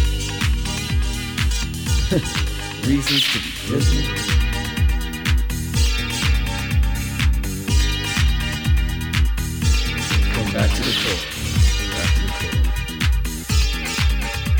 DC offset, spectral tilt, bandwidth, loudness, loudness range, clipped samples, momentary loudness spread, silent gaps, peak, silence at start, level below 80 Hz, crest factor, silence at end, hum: under 0.1%; -4 dB/octave; over 20 kHz; -21 LUFS; 1 LU; under 0.1%; 4 LU; none; -4 dBFS; 0 s; -22 dBFS; 16 dB; 0 s; none